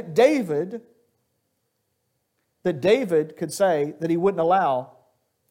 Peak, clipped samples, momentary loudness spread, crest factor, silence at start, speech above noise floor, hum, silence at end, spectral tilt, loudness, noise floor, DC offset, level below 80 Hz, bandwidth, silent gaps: -6 dBFS; under 0.1%; 10 LU; 18 dB; 0 s; 53 dB; none; 0.65 s; -6 dB/octave; -22 LUFS; -74 dBFS; under 0.1%; -70 dBFS; 17 kHz; none